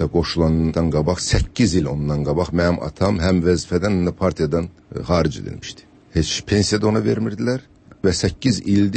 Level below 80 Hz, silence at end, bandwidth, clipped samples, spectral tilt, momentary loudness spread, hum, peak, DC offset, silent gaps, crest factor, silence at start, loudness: -34 dBFS; 0 s; 8.8 kHz; under 0.1%; -5.5 dB/octave; 6 LU; none; -4 dBFS; under 0.1%; none; 14 dB; 0 s; -20 LUFS